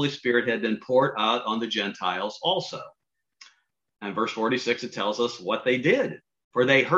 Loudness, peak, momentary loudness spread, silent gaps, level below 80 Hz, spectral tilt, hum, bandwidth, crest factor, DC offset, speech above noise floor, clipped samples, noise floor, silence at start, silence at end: -25 LUFS; -6 dBFS; 10 LU; 6.44-6.51 s; -72 dBFS; -4.5 dB/octave; none; 7.8 kHz; 20 dB; under 0.1%; 40 dB; under 0.1%; -65 dBFS; 0 s; 0 s